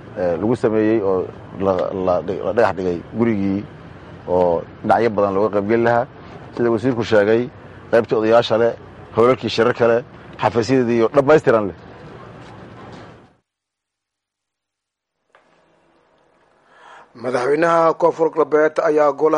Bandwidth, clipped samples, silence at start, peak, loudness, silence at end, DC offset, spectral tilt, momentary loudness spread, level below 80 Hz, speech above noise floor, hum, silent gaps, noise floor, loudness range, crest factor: 10 kHz; under 0.1%; 0.05 s; -2 dBFS; -18 LUFS; 0 s; under 0.1%; -7 dB/octave; 23 LU; -54 dBFS; 65 dB; none; none; -82 dBFS; 4 LU; 16 dB